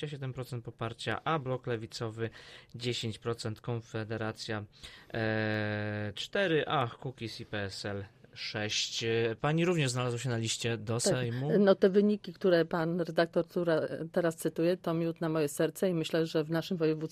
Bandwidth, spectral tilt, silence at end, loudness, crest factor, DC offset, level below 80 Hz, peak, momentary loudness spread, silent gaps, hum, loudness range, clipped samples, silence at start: 15 kHz; -5 dB/octave; 0.05 s; -32 LUFS; 20 dB; under 0.1%; -66 dBFS; -12 dBFS; 12 LU; none; none; 8 LU; under 0.1%; 0 s